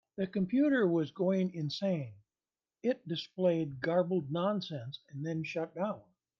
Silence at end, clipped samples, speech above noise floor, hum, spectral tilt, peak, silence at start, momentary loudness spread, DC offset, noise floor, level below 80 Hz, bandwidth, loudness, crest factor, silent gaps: 0.4 s; under 0.1%; over 57 dB; none; -7.5 dB/octave; -18 dBFS; 0.2 s; 11 LU; under 0.1%; under -90 dBFS; -78 dBFS; 7 kHz; -33 LUFS; 16 dB; none